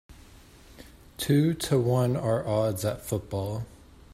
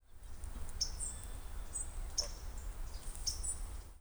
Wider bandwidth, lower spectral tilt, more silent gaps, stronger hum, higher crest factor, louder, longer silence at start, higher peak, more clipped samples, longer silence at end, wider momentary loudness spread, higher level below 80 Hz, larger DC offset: second, 16 kHz vs over 20 kHz; first, -6.5 dB/octave vs -1.5 dB/octave; neither; neither; about the same, 16 dB vs 20 dB; first, -27 LUFS vs -42 LUFS; about the same, 0.1 s vs 0.1 s; first, -12 dBFS vs -22 dBFS; neither; first, 0.35 s vs 0 s; about the same, 11 LU vs 11 LU; second, -52 dBFS vs -44 dBFS; neither